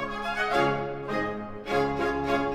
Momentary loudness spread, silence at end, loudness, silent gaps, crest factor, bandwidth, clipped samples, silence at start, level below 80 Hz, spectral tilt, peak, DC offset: 7 LU; 0 s; -28 LUFS; none; 16 dB; 15.5 kHz; under 0.1%; 0 s; -48 dBFS; -5.5 dB/octave; -12 dBFS; under 0.1%